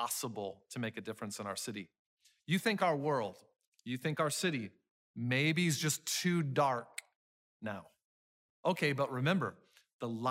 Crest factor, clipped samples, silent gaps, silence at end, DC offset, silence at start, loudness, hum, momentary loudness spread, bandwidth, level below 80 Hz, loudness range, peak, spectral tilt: 18 dB; under 0.1%; 1.99-2.17 s, 3.67-3.72 s, 4.91-5.14 s, 7.16-7.60 s, 8.04-8.63 s, 9.93-9.99 s; 0 s; under 0.1%; 0 s; -35 LUFS; none; 15 LU; 16 kHz; -80 dBFS; 4 LU; -18 dBFS; -4.5 dB/octave